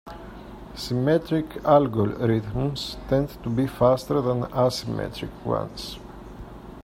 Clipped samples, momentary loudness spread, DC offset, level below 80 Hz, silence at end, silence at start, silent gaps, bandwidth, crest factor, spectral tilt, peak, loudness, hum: under 0.1%; 21 LU; under 0.1%; -44 dBFS; 0 s; 0.05 s; none; 16 kHz; 20 dB; -7 dB/octave; -4 dBFS; -24 LUFS; none